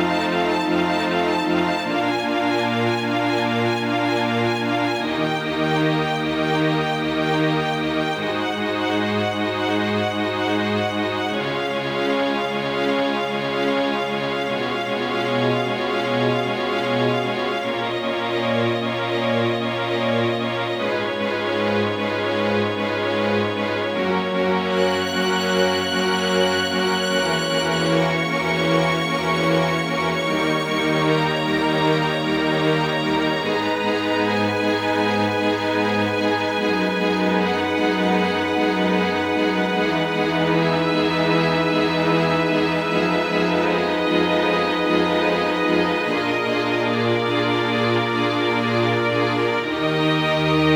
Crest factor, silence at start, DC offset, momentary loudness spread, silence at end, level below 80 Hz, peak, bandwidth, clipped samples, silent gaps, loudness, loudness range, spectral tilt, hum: 16 dB; 0 s; under 0.1%; 4 LU; 0 s; -54 dBFS; -4 dBFS; 19.5 kHz; under 0.1%; none; -20 LUFS; 3 LU; -5.5 dB/octave; none